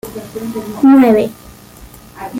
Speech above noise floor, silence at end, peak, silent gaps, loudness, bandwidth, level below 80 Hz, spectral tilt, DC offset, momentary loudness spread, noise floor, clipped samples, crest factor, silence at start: 26 dB; 0 s; -2 dBFS; none; -12 LUFS; 16.5 kHz; -46 dBFS; -6.5 dB/octave; under 0.1%; 19 LU; -37 dBFS; under 0.1%; 12 dB; 0.05 s